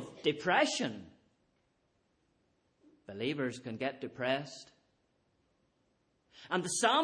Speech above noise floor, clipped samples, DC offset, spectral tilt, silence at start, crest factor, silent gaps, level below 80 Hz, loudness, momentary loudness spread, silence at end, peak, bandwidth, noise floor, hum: 43 dB; under 0.1%; under 0.1%; -3 dB/octave; 0 s; 22 dB; none; -78 dBFS; -34 LUFS; 17 LU; 0 s; -14 dBFS; 10.5 kHz; -76 dBFS; none